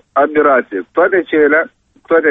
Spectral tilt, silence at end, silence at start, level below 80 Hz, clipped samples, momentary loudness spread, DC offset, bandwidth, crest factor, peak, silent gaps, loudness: -8 dB/octave; 0 s; 0.15 s; -54 dBFS; under 0.1%; 5 LU; under 0.1%; 3.9 kHz; 12 dB; -2 dBFS; none; -13 LUFS